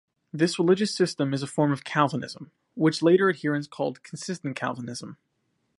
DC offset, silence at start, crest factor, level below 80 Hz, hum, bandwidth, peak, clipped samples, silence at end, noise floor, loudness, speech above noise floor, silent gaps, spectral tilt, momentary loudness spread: under 0.1%; 0.35 s; 20 dB; -72 dBFS; none; 11.5 kHz; -6 dBFS; under 0.1%; 0.65 s; -74 dBFS; -25 LUFS; 49 dB; none; -5.5 dB/octave; 17 LU